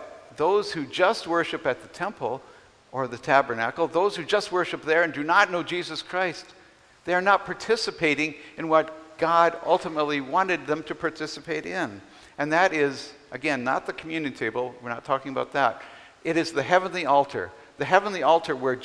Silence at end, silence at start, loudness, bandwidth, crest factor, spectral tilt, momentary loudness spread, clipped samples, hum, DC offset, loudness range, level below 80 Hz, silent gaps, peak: 0 s; 0 s; -25 LUFS; 11 kHz; 22 dB; -4.5 dB/octave; 12 LU; under 0.1%; none; under 0.1%; 3 LU; -64 dBFS; none; -2 dBFS